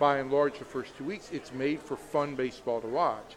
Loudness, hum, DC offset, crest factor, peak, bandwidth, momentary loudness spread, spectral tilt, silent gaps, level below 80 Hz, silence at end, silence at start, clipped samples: -32 LUFS; none; under 0.1%; 20 dB; -12 dBFS; 13.5 kHz; 11 LU; -6 dB/octave; none; -64 dBFS; 0 s; 0 s; under 0.1%